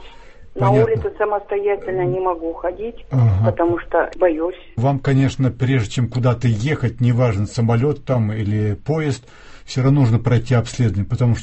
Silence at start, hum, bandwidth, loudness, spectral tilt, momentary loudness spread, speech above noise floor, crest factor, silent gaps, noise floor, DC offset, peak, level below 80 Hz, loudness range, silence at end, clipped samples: 0 s; none; 8.4 kHz; -19 LUFS; -8 dB/octave; 7 LU; 21 dB; 16 dB; none; -38 dBFS; under 0.1%; -2 dBFS; -38 dBFS; 1 LU; 0 s; under 0.1%